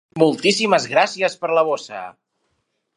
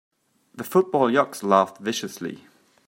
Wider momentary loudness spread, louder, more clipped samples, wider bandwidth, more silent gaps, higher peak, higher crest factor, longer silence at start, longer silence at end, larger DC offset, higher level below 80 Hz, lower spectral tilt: first, 17 LU vs 14 LU; first, -18 LUFS vs -22 LUFS; neither; second, 11.5 kHz vs 16.5 kHz; neither; first, 0 dBFS vs -4 dBFS; about the same, 20 dB vs 22 dB; second, 0.15 s vs 0.55 s; first, 0.85 s vs 0.5 s; neither; about the same, -70 dBFS vs -72 dBFS; about the same, -4 dB/octave vs -5 dB/octave